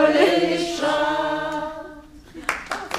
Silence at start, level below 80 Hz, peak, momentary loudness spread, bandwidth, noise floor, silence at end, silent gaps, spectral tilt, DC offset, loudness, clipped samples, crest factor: 0 s; -50 dBFS; -2 dBFS; 18 LU; 15.5 kHz; -42 dBFS; 0 s; none; -3.5 dB/octave; under 0.1%; -22 LUFS; under 0.1%; 20 dB